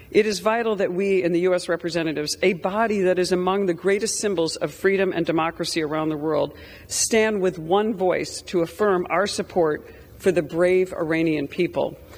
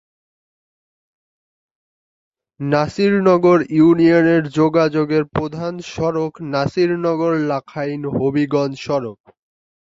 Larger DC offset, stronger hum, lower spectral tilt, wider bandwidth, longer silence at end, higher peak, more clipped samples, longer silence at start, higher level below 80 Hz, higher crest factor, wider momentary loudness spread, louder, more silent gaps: neither; neither; second, -4 dB/octave vs -7.5 dB/octave; first, over 20 kHz vs 7.8 kHz; second, 0 s vs 0.85 s; second, -6 dBFS vs -2 dBFS; neither; second, 0 s vs 2.6 s; about the same, -54 dBFS vs -54 dBFS; about the same, 16 dB vs 16 dB; second, 5 LU vs 11 LU; second, -22 LUFS vs -17 LUFS; neither